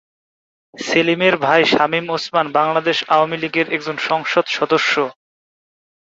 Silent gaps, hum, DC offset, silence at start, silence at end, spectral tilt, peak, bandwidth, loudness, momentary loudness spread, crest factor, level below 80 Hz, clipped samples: none; none; under 0.1%; 0.75 s; 1 s; -4 dB/octave; -2 dBFS; 7.8 kHz; -17 LUFS; 6 LU; 18 dB; -62 dBFS; under 0.1%